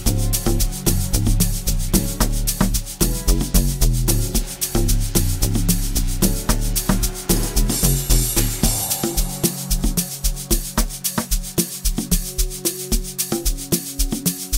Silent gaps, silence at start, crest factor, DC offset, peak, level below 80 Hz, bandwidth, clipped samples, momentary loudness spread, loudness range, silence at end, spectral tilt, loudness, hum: none; 0 s; 18 dB; under 0.1%; 0 dBFS; -22 dBFS; 16.5 kHz; under 0.1%; 4 LU; 3 LU; 0 s; -4 dB/octave; -20 LUFS; none